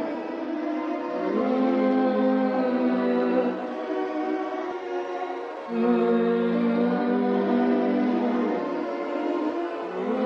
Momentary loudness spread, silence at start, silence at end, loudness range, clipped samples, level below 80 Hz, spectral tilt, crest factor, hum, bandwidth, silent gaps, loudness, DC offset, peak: 8 LU; 0 s; 0 s; 3 LU; under 0.1%; -72 dBFS; -8 dB/octave; 14 dB; none; 6.4 kHz; none; -25 LUFS; under 0.1%; -12 dBFS